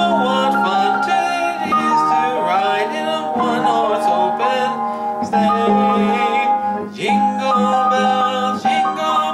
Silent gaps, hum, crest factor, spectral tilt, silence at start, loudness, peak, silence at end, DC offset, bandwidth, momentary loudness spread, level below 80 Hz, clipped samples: none; none; 12 dB; -5 dB/octave; 0 s; -17 LUFS; -4 dBFS; 0 s; under 0.1%; 13.5 kHz; 5 LU; -60 dBFS; under 0.1%